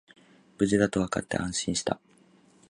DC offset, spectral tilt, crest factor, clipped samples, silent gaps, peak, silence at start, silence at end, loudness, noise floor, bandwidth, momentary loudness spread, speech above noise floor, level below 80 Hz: under 0.1%; -4.5 dB/octave; 22 dB; under 0.1%; none; -8 dBFS; 0.6 s; 0.75 s; -28 LUFS; -60 dBFS; 11.5 kHz; 7 LU; 33 dB; -54 dBFS